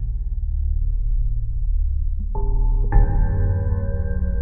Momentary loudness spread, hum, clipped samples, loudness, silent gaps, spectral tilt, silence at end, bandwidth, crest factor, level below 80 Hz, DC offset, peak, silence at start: 7 LU; none; under 0.1%; -24 LUFS; none; -13.5 dB/octave; 0 s; 2 kHz; 16 dB; -20 dBFS; under 0.1%; -2 dBFS; 0 s